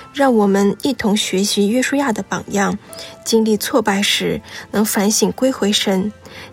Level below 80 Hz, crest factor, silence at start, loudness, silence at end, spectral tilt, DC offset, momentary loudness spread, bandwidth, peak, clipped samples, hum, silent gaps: -52 dBFS; 14 dB; 0 s; -17 LUFS; 0 s; -4 dB/octave; under 0.1%; 9 LU; 16.5 kHz; -2 dBFS; under 0.1%; none; none